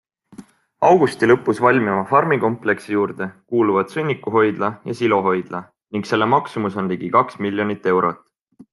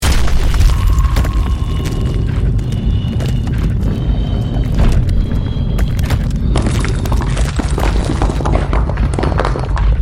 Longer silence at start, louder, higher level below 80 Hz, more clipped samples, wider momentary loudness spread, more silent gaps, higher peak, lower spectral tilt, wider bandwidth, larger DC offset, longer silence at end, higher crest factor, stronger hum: first, 0.4 s vs 0 s; second, -19 LUFS vs -16 LUFS; second, -64 dBFS vs -16 dBFS; neither; first, 9 LU vs 3 LU; neither; about the same, -2 dBFS vs 0 dBFS; about the same, -7 dB/octave vs -6.5 dB/octave; second, 12 kHz vs 15.5 kHz; neither; first, 0.55 s vs 0 s; first, 18 dB vs 12 dB; neither